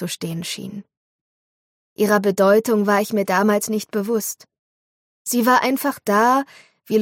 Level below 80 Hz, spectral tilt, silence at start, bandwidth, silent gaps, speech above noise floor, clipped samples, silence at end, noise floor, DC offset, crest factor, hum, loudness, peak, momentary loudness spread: -68 dBFS; -4.5 dB/octave; 0 s; 17 kHz; 0.97-1.96 s, 4.59-5.25 s; over 71 dB; under 0.1%; 0 s; under -90 dBFS; under 0.1%; 16 dB; none; -19 LUFS; -4 dBFS; 14 LU